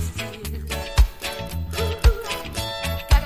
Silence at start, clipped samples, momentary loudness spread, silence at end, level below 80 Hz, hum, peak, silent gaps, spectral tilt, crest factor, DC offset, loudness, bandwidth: 0 s; under 0.1%; 9 LU; 0 s; -24 dBFS; none; -4 dBFS; none; -4.5 dB/octave; 18 dB; under 0.1%; -25 LUFS; 16 kHz